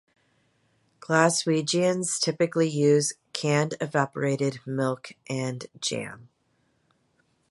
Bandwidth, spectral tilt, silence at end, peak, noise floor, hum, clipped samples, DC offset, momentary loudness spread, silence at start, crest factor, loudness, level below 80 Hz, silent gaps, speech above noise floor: 11.5 kHz; -4.5 dB/octave; 1.25 s; -4 dBFS; -70 dBFS; none; under 0.1%; under 0.1%; 11 LU; 1.1 s; 22 dB; -26 LUFS; -72 dBFS; none; 45 dB